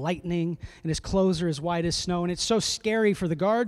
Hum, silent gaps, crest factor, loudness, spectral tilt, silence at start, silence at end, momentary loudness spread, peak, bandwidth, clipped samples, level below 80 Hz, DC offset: none; none; 14 dB; -26 LUFS; -5 dB/octave; 0 s; 0 s; 7 LU; -12 dBFS; 13 kHz; under 0.1%; -46 dBFS; under 0.1%